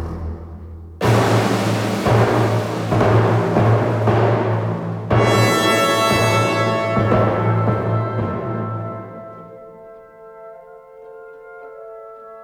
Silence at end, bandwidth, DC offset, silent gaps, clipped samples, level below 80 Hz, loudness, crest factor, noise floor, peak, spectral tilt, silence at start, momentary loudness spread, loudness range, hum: 0 s; 17 kHz; under 0.1%; none; under 0.1%; -42 dBFS; -17 LUFS; 16 dB; -40 dBFS; -2 dBFS; -6 dB/octave; 0 s; 22 LU; 14 LU; none